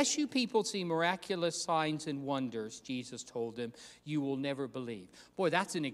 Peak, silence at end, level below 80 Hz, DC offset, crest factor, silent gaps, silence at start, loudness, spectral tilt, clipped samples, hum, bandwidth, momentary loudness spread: -14 dBFS; 0 s; -76 dBFS; under 0.1%; 22 dB; none; 0 s; -35 LUFS; -4 dB/octave; under 0.1%; none; 14.5 kHz; 11 LU